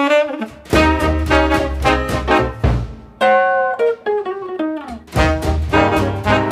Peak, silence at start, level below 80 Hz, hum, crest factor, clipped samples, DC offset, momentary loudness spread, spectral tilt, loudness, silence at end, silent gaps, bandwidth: 0 dBFS; 0 s; -26 dBFS; none; 16 dB; under 0.1%; under 0.1%; 9 LU; -6 dB/octave; -16 LUFS; 0 s; none; 15.5 kHz